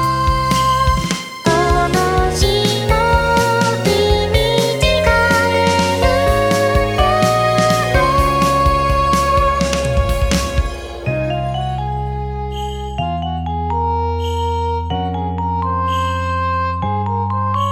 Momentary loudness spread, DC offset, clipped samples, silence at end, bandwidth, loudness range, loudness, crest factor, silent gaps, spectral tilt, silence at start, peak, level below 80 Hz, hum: 8 LU; under 0.1%; under 0.1%; 0 s; 19 kHz; 7 LU; -16 LUFS; 16 dB; none; -5 dB/octave; 0 s; 0 dBFS; -24 dBFS; none